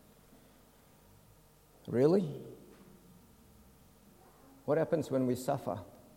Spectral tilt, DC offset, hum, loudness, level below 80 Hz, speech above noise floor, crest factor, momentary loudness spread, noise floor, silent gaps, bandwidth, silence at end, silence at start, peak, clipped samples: -7.5 dB/octave; under 0.1%; none; -33 LUFS; -68 dBFS; 31 dB; 22 dB; 21 LU; -62 dBFS; none; 16.5 kHz; 0.3 s; 1.85 s; -14 dBFS; under 0.1%